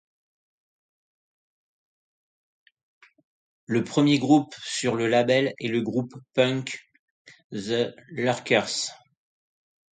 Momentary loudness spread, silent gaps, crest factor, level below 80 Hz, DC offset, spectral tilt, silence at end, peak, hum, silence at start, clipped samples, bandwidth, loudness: 10 LU; 6.99-7.25 s, 7.44-7.50 s; 22 dB; -70 dBFS; under 0.1%; -5 dB/octave; 1.05 s; -6 dBFS; none; 3.7 s; under 0.1%; 9.4 kHz; -25 LUFS